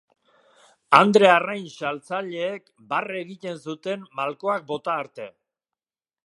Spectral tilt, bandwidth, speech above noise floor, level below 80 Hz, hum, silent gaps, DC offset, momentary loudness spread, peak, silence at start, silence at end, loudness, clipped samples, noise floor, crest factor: -5 dB/octave; 11.5 kHz; over 67 dB; -76 dBFS; none; none; under 0.1%; 18 LU; 0 dBFS; 0.9 s; 0.95 s; -22 LUFS; under 0.1%; under -90 dBFS; 24 dB